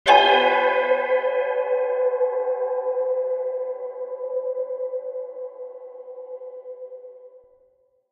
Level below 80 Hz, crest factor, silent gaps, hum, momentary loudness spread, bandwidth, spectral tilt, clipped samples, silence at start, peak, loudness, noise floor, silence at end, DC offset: -70 dBFS; 20 dB; none; none; 20 LU; 9.2 kHz; -2 dB/octave; under 0.1%; 0.05 s; -2 dBFS; -22 LUFS; -62 dBFS; 0.75 s; under 0.1%